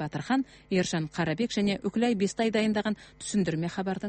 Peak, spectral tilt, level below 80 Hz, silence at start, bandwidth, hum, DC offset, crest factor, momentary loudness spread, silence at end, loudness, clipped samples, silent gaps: -14 dBFS; -5.5 dB/octave; -60 dBFS; 0 s; 8.8 kHz; none; under 0.1%; 16 dB; 5 LU; 0 s; -29 LUFS; under 0.1%; none